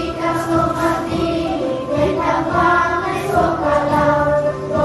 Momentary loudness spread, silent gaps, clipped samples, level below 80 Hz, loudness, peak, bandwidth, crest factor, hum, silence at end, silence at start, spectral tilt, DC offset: 5 LU; none; under 0.1%; -36 dBFS; -17 LUFS; -2 dBFS; 13 kHz; 14 dB; none; 0 s; 0 s; -6.5 dB/octave; under 0.1%